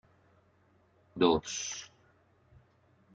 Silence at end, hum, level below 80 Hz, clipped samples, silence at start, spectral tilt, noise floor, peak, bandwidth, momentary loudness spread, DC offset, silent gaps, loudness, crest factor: 1.3 s; none; -64 dBFS; under 0.1%; 1.15 s; -3.5 dB/octave; -67 dBFS; -12 dBFS; 9.4 kHz; 23 LU; under 0.1%; none; -31 LUFS; 26 dB